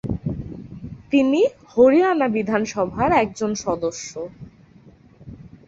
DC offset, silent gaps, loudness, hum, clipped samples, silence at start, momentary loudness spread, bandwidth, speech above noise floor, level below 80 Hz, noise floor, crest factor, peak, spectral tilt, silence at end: under 0.1%; none; -20 LUFS; none; under 0.1%; 0.05 s; 20 LU; 8 kHz; 30 dB; -46 dBFS; -49 dBFS; 18 dB; -4 dBFS; -6 dB/octave; 0.2 s